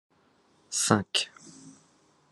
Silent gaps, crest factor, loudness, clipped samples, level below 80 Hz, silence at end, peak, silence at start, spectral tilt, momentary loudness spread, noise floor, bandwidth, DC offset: none; 28 dB; -27 LUFS; under 0.1%; -74 dBFS; 0.6 s; -4 dBFS; 0.7 s; -3 dB/octave; 25 LU; -65 dBFS; 13 kHz; under 0.1%